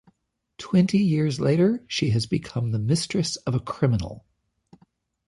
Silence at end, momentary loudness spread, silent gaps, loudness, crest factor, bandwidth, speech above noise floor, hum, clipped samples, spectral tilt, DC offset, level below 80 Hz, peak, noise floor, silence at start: 1.1 s; 7 LU; none; -24 LUFS; 16 dB; 11.5 kHz; 47 dB; none; under 0.1%; -6 dB/octave; under 0.1%; -50 dBFS; -8 dBFS; -69 dBFS; 0.6 s